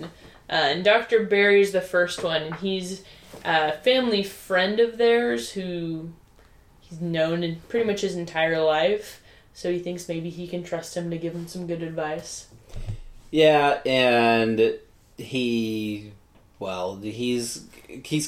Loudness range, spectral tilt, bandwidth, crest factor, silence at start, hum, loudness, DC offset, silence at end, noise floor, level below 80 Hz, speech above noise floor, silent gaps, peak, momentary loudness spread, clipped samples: 9 LU; -4.5 dB/octave; 16 kHz; 20 dB; 0 s; none; -24 LUFS; under 0.1%; 0 s; -54 dBFS; -50 dBFS; 30 dB; none; -4 dBFS; 18 LU; under 0.1%